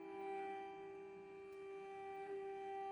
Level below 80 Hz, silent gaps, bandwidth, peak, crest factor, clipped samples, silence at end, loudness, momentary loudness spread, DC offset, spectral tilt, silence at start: -86 dBFS; none; 11 kHz; -38 dBFS; 12 dB; under 0.1%; 0 s; -51 LUFS; 7 LU; under 0.1%; -5.5 dB/octave; 0 s